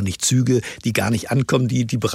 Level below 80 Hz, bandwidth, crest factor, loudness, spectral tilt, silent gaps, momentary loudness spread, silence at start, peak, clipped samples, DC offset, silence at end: -50 dBFS; 16 kHz; 14 dB; -20 LUFS; -5 dB/octave; none; 3 LU; 0 s; -4 dBFS; under 0.1%; under 0.1%; 0 s